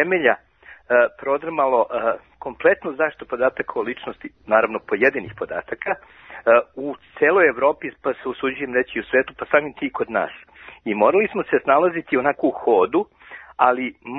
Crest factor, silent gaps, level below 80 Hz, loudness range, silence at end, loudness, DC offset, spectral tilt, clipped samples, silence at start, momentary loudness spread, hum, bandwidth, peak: 20 dB; none; -58 dBFS; 3 LU; 0 s; -20 LUFS; under 0.1%; -8 dB/octave; under 0.1%; 0 s; 13 LU; none; 4 kHz; -2 dBFS